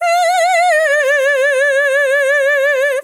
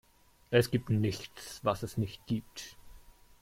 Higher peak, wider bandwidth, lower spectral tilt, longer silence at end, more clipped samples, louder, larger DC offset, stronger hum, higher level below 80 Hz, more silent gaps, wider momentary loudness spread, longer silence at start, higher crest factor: first, -4 dBFS vs -14 dBFS; about the same, 17 kHz vs 16.5 kHz; second, 4.5 dB/octave vs -6 dB/octave; second, 0 s vs 0.45 s; neither; first, -12 LUFS vs -33 LUFS; neither; neither; second, under -90 dBFS vs -58 dBFS; neither; second, 1 LU vs 17 LU; second, 0 s vs 0.5 s; second, 8 dB vs 20 dB